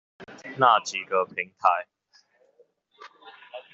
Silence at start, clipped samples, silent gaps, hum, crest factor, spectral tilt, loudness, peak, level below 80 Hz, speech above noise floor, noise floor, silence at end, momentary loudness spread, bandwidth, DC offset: 0.2 s; under 0.1%; none; none; 24 dB; -1 dB/octave; -24 LUFS; -4 dBFS; -80 dBFS; 39 dB; -63 dBFS; 0.15 s; 26 LU; 7.6 kHz; under 0.1%